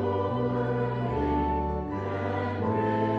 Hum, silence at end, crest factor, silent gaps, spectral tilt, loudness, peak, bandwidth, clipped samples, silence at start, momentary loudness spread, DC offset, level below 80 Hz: none; 0 s; 14 dB; none; -9.5 dB/octave; -29 LUFS; -14 dBFS; 7 kHz; under 0.1%; 0 s; 4 LU; under 0.1%; -40 dBFS